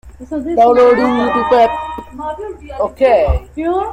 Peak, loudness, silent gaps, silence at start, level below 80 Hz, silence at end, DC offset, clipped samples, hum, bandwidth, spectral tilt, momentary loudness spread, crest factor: -2 dBFS; -13 LUFS; none; 0.05 s; -30 dBFS; 0 s; under 0.1%; under 0.1%; none; 9.2 kHz; -7 dB/octave; 16 LU; 12 dB